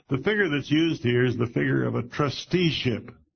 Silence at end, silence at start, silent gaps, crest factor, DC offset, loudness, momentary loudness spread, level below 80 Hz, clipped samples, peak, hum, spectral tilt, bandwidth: 0.2 s; 0.1 s; none; 16 dB; under 0.1%; -25 LUFS; 5 LU; -54 dBFS; under 0.1%; -8 dBFS; none; -6.5 dB/octave; 6.6 kHz